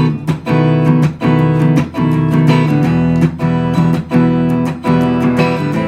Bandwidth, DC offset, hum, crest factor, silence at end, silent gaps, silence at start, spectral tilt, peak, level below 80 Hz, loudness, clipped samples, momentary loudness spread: 9.6 kHz; under 0.1%; none; 12 dB; 0 s; none; 0 s; -8.5 dB/octave; 0 dBFS; -40 dBFS; -13 LUFS; under 0.1%; 4 LU